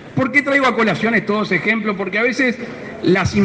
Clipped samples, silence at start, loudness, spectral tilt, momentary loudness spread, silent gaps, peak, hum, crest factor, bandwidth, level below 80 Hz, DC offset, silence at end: under 0.1%; 0 s; -16 LUFS; -6 dB/octave; 6 LU; none; 0 dBFS; none; 16 dB; 9.2 kHz; -50 dBFS; under 0.1%; 0 s